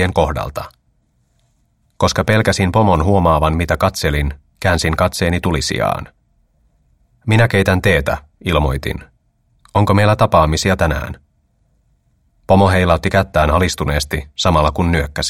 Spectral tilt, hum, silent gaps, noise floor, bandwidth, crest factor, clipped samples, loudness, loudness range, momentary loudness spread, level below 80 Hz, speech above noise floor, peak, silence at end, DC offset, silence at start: -5.5 dB/octave; none; none; -60 dBFS; 16.5 kHz; 16 dB; under 0.1%; -15 LUFS; 2 LU; 11 LU; -28 dBFS; 46 dB; 0 dBFS; 0 s; under 0.1%; 0 s